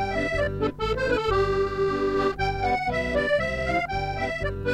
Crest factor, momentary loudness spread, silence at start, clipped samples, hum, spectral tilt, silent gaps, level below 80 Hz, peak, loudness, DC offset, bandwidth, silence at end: 14 dB; 4 LU; 0 s; under 0.1%; none; -6 dB/octave; none; -38 dBFS; -12 dBFS; -25 LUFS; under 0.1%; 10.5 kHz; 0 s